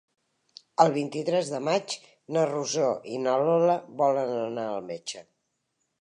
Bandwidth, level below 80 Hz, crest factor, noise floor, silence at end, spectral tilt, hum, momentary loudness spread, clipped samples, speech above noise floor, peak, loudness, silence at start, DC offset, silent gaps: 11 kHz; -80 dBFS; 24 dB; -78 dBFS; 0.8 s; -5 dB/octave; none; 13 LU; under 0.1%; 52 dB; -4 dBFS; -27 LUFS; 0.8 s; under 0.1%; none